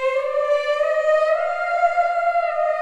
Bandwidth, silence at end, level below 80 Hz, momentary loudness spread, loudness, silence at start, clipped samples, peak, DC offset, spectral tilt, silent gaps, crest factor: 9.8 kHz; 0 s; -60 dBFS; 3 LU; -20 LUFS; 0 s; under 0.1%; -8 dBFS; under 0.1%; 0 dB/octave; none; 12 dB